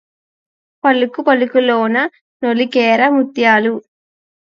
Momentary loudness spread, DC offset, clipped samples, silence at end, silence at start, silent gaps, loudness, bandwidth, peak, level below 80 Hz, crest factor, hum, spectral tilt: 8 LU; under 0.1%; under 0.1%; 0.6 s; 0.85 s; 2.21-2.40 s; -14 LUFS; 7 kHz; 0 dBFS; -70 dBFS; 16 dB; none; -5.5 dB/octave